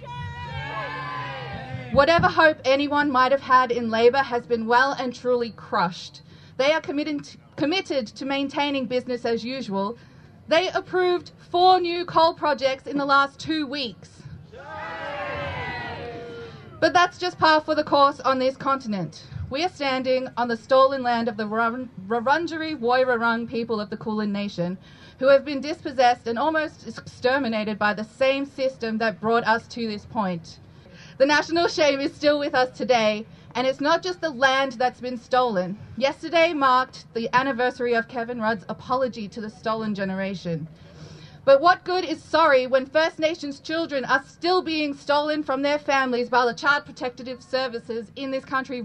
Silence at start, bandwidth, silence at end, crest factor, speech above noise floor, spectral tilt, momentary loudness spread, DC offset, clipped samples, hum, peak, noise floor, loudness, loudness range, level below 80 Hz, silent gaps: 0 s; 9.4 kHz; 0 s; 22 dB; 23 dB; -5 dB/octave; 13 LU; under 0.1%; under 0.1%; none; -2 dBFS; -46 dBFS; -23 LUFS; 5 LU; -56 dBFS; none